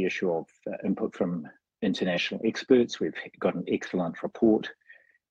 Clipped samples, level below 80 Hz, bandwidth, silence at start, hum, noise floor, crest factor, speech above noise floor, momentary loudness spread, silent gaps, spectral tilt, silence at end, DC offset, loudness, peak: under 0.1%; -66 dBFS; 8 kHz; 0 s; none; -58 dBFS; 20 dB; 30 dB; 10 LU; none; -6 dB/octave; 0.6 s; under 0.1%; -28 LUFS; -8 dBFS